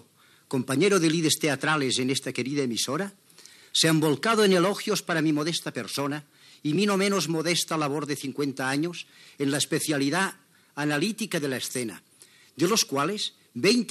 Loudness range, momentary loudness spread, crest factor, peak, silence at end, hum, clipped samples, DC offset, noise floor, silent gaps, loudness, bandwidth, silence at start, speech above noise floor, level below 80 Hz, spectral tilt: 3 LU; 10 LU; 18 dB; -8 dBFS; 0 s; none; under 0.1%; under 0.1%; -58 dBFS; none; -26 LUFS; 13.5 kHz; 0.5 s; 32 dB; -88 dBFS; -4 dB/octave